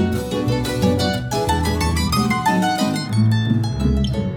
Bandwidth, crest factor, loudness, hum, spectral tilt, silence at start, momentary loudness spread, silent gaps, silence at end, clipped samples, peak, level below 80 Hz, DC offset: over 20 kHz; 16 dB; -19 LUFS; none; -5.5 dB/octave; 0 s; 3 LU; none; 0 s; under 0.1%; -4 dBFS; -32 dBFS; under 0.1%